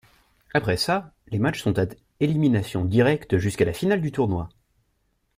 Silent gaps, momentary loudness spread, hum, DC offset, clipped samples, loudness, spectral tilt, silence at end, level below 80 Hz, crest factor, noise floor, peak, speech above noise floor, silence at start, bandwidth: none; 7 LU; none; under 0.1%; under 0.1%; -24 LUFS; -6.5 dB/octave; 0.9 s; -50 dBFS; 18 dB; -70 dBFS; -6 dBFS; 48 dB; 0.55 s; 16 kHz